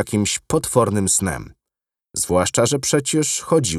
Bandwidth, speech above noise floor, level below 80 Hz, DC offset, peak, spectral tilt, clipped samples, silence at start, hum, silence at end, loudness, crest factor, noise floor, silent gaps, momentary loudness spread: 15.5 kHz; 67 dB; -48 dBFS; under 0.1%; 0 dBFS; -4 dB/octave; under 0.1%; 0 s; none; 0 s; -19 LUFS; 20 dB; -86 dBFS; none; 7 LU